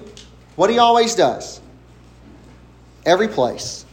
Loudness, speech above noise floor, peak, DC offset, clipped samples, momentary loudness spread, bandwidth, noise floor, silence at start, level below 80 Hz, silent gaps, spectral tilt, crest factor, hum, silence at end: -17 LUFS; 29 dB; 0 dBFS; under 0.1%; under 0.1%; 20 LU; 16 kHz; -45 dBFS; 0 s; -50 dBFS; none; -3.5 dB/octave; 18 dB; 60 Hz at -50 dBFS; 0.1 s